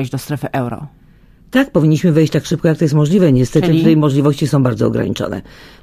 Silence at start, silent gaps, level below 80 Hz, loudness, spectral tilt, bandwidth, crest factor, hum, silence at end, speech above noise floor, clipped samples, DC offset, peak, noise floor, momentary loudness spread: 0 s; none; -42 dBFS; -14 LUFS; -7.5 dB/octave; 15 kHz; 14 dB; none; 0.15 s; 31 dB; under 0.1%; under 0.1%; 0 dBFS; -45 dBFS; 10 LU